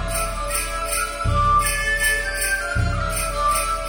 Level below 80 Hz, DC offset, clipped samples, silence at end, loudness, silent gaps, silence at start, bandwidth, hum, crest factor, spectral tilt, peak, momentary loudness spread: -28 dBFS; under 0.1%; under 0.1%; 0 s; -21 LUFS; none; 0 s; 18 kHz; none; 14 dB; -2.5 dB/octave; -8 dBFS; 6 LU